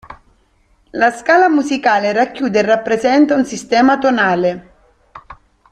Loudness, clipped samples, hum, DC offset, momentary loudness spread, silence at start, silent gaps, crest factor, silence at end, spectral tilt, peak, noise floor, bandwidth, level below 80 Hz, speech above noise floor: -14 LUFS; under 0.1%; none; under 0.1%; 6 LU; 0.1 s; none; 14 dB; 0.4 s; -5 dB/octave; 0 dBFS; -55 dBFS; 10.5 kHz; -52 dBFS; 42 dB